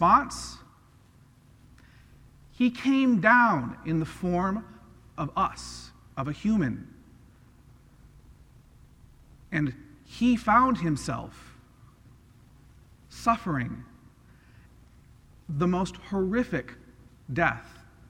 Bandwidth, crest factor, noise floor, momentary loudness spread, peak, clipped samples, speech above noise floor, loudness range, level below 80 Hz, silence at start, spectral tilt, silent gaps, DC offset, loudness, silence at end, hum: 12.5 kHz; 22 dB; -57 dBFS; 22 LU; -6 dBFS; under 0.1%; 31 dB; 9 LU; -52 dBFS; 0 s; -6 dB/octave; none; under 0.1%; -26 LUFS; 0.4 s; none